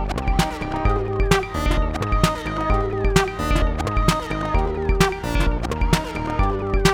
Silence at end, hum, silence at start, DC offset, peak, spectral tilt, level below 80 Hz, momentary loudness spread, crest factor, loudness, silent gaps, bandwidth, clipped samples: 0 s; none; 0 s; under 0.1%; -2 dBFS; -5.5 dB/octave; -24 dBFS; 3 LU; 18 dB; -22 LUFS; none; 17 kHz; under 0.1%